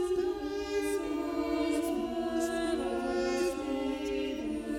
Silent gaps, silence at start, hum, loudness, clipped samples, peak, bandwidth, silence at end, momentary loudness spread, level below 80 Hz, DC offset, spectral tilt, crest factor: none; 0 s; none; -33 LUFS; under 0.1%; -20 dBFS; 16.5 kHz; 0 s; 3 LU; -54 dBFS; under 0.1%; -4.5 dB/octave; 12 dB